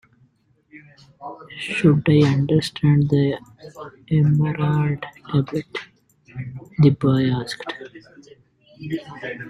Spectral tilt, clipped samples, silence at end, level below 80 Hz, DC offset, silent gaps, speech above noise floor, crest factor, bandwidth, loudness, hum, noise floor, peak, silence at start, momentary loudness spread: -8 dB/octave; under 0.1%; 0 s; -52 dBFS; under 0.1%; none; 40 dB; 18 dB; 10.5 kHz; -20 LUFS; none; -60 dBFS; -4 dBFS; 0.75 s; 21 LU